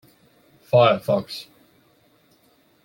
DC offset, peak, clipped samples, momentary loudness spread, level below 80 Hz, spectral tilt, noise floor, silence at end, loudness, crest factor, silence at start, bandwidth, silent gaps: under 0.1%; -4 dBFS; under 0.1%; 18 LU; -66 dBFS; -6.5 dB/octave; -60 dBFS; 1.45 s; -19 LUFS; 20 dB; 0.75 s; 17 kHz; none